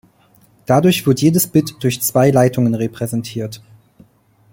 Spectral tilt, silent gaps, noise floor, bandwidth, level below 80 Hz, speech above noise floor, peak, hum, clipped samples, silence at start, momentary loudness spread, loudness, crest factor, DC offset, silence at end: -5.5 dB/octave; none; -52 dBFS; 17 kHz; -52 dBFS; 37 dB; 0 dBFS; none; under 0.1%; 0.7 s; 14 LU; -16 LUFS; 16 dB; under 0.1%; 0.95 s